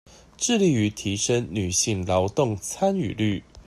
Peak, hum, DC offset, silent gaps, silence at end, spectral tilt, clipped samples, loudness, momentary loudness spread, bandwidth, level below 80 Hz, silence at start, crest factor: -8 dBFS; none; under 0.1%; none; 0.05 s; -4.5 dB/octave; under 0.1%; -24 LUFS; 5 LU; 14 kHz; -52 dBFS; 0.4 s; 16 dB